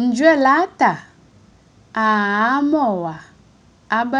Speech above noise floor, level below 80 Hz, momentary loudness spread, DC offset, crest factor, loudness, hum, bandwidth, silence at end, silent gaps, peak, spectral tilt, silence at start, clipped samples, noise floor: 34 dB; -60 dBFS; 15 LU; under 0.1%; 18 dB; -17 LUFS; none; 10 kHz; 0 s; none; -2 dBFS; -5.5 dB/octave; 0 s; under 0.1%; -51 dBFS